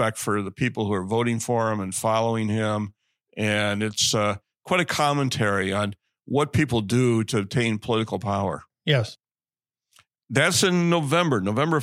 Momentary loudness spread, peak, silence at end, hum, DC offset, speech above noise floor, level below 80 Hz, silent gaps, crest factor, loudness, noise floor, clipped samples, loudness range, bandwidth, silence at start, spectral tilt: 6 LU; -4 dBFS; 0 s; none; under 0.1%; over 67 dB; -58 dBFS; none; 20 dB; -23 LUFS; under -90 dBFS; under 0.1%; 2 LU; 16 kHz; 0 s; -4.5 dB/octave